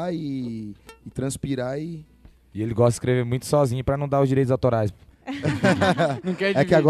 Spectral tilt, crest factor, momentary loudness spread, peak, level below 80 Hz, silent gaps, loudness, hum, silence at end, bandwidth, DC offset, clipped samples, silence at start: -6.5 dB/octave; 18 dB; 15 LU; -6 dBFS; -48 dBFS; none; -23 LUFS; none; 0 s; 13.5 kHz; under 0.1%; under 0.1%; 0 s